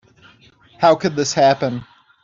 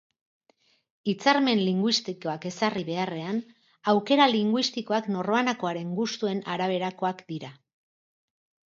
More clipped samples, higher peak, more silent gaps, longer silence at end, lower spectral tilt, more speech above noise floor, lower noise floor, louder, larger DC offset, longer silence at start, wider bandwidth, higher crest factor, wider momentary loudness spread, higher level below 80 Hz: neither; first, -2 dBFS vs -6 dBFS; neither; second, 0.4 s vs 1.15 s; about the same, -4.5 dB/octave vs -5 dB/octave; second, 35 dB vs 41 dB; second, -50 dBFS vs -67 dBFS; first, -17 LUFS vs -26 LUFS; neither; second, 0.8 s vs 1.05 s; about the same, 7.6 kHz vs 7.6 kHz; second, 16 dB vs 22 dB; about the same, 9 LU vs 11 LU; first, -60 dBFS vs -76 dBFS